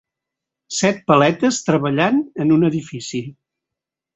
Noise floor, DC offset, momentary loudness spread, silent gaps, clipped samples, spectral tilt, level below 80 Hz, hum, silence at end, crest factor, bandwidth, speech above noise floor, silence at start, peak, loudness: -85 dBFS; under 0.1%; 12 LU; none; under 0.1%; -5 dB/octave; -58 dBFS; none; 0.85 s; 18 dB; 8.2 kHz; 67 dB; 0.7 s; -2 dBFS; -18 LUFS